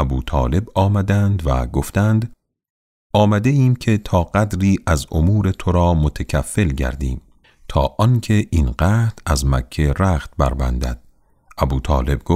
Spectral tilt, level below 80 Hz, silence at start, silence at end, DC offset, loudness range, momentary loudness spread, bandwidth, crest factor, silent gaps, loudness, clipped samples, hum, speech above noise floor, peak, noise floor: -7 dB/octave; -26 dBFS; 0 s; 0 s; under 0.1%; 2 LU; 7 LU; 15 kHz; 14 dB; 2.70-3.10 s; -18 LUFS; under 0.1%; none; 33 dB; -2 dBFS; -50 dBFS